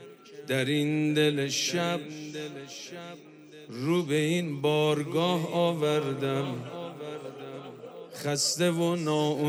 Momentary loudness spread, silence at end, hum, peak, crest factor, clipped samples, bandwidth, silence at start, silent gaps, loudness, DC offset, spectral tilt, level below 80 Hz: 18 LU; 0 s; none; -14 dBFS; 16 dB; under 0.1%; over 20 kHz; 0 s; none; -28 LUFS; under 0.1%; -4.5 dB/octave; -78 dBFS